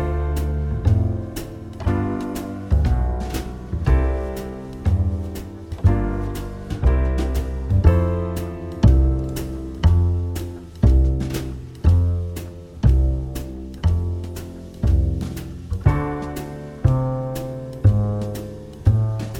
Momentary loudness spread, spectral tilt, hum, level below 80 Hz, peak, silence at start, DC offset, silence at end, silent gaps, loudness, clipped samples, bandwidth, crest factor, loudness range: 13 LU; -8 dB/octave; none; -24 dBFS; -2 dBFS; 0 s; under 0.1%; 0 s; none; -22 LUFS; under 0.1%; 16.5 kHz; 18 dB; 3 LU